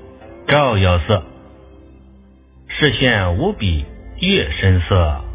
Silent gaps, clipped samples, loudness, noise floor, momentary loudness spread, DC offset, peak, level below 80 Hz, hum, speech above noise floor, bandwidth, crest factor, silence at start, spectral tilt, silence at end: none; under 0.1%; -16 LUFS; -46 dBFS; 8 LU; under 0.1%; 0 dBFS; -26 dBFS; none; 30 dB; 4 kHz; 18 dB; 0 s; -10 dB/octave; 0 s